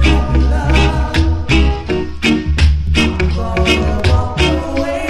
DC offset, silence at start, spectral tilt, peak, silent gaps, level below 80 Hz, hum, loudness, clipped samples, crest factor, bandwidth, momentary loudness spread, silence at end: under 0.1%; 0 s; -6 dB/octave; 0 dBFS; none; -16 dBFS; none; -14 LUFS; under 0.1%; 12 dB; 11.5 kHz; 4 LU; 0 s